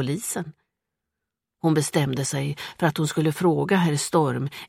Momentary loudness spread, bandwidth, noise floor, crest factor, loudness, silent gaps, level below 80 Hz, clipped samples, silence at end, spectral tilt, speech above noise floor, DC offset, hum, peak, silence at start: 8 LU; 16 kHz; -85 dBFS; 18 dB; -24 LUFS; none; -62 dBFS; under 0.1%; 0.05 s; -5.5 dB/octave; 62 dB; under 0.1%; none; -6 dBFS; 0 s